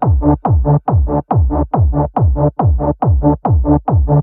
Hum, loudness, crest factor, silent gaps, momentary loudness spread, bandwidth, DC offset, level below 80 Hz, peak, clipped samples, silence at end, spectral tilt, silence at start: none; -14 LUFS; 12 dB; none; 2 LU; 2.6 kHz; under 0.1%; -18 dBFS; 0 dBFS; under 0.1%; 0 s; -15.5 dB/octave; 0 s